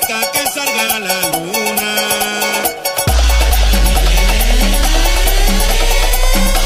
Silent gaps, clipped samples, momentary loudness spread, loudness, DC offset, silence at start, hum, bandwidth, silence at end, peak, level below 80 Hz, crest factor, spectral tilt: none; under 0.1%; 2 LU; -14 LUFS; under 0.1%; 0 s; none; 15.5 kHz; 0 s; 0 dBFS; -14 dBFS; 12 dB; -3 dB/octave